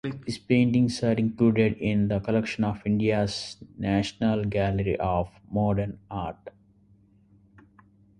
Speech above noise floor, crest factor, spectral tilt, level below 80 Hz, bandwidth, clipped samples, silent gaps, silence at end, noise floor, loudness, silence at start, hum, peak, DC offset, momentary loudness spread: 34 dB; 18 dB; -7 dB/octave; -48 dBFS; 11.5 kHz; under 0.1%; none; 1.7 s; -59 dBFS; -26 LUFS; 0.05 s; none; -8 dBFS; under 0.1%; 12 LU